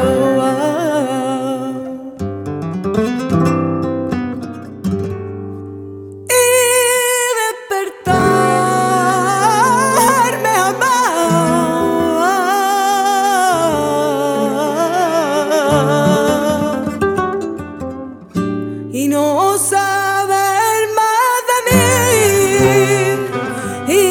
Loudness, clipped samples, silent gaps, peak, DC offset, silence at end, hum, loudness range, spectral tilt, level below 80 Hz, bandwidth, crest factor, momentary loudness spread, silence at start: -14 LUFS; under 0.1%; none; 0 dBFS; under 0.1%; 0 s; none; 6 LU; -4 dB/octave; -46 dBFS; 19 kHz; 14 dB; 13 LU; 0 s